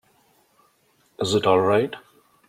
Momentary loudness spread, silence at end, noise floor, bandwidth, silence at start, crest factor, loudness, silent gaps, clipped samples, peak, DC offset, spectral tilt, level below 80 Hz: 12 LU; 0.5 s; -63 dBFS; 15.5 kHz; 1.2 s; 20 dB; -21 LUFS; none; under 0.1%; -4 dBFS; under 0.1%; -5 dB/octave; -64 dBFS